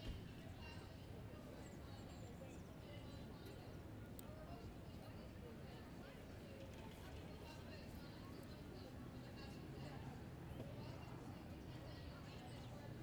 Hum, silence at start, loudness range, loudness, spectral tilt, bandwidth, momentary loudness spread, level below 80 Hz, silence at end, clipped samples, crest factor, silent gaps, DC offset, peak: none; 0 s; 2 LU; -55 LUFS; -6 dB/octave; over 20 kHz; 3 LU; -62 dBFS; 0 s; under 0.1%; 20 dB; none; under 0.1%; -34 dBFS